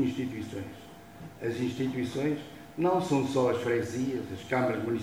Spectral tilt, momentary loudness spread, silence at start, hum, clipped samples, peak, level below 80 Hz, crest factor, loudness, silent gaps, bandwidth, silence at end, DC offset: -6.5 dB/octave; 16 LU; 0 s; none; under 0.1%; -14 dBFS; -64 dBFS; 16 dB; -31 LUFS; none; 16.5 kHz; 0 s; under 0.1%